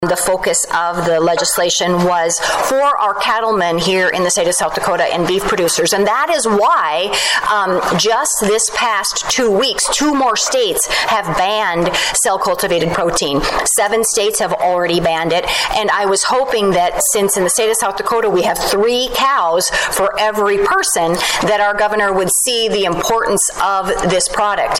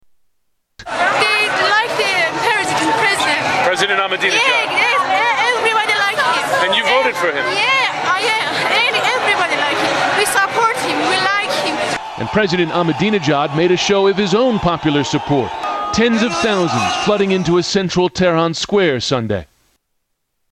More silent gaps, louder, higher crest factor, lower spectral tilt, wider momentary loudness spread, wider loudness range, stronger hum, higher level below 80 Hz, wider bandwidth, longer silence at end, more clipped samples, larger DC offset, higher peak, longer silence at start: neither; about the same, -14 LUFS vs -15 LUFS; second, 8 dB vs 14 dB; second, -2 dB/octave vs -3.5 dB/octave; about the same, 2 LU vs 4 LU; about the same, 1 LU vs 2 LU; neither; first, -40 dBFS vs -48 dBFS; first, 16.5 kHz vs 14 kHz; second, 0 s vs 1.1 s; neither; neither; second, -6 dBFS vs -2 dBFS; second, 0 s vs 0.8 s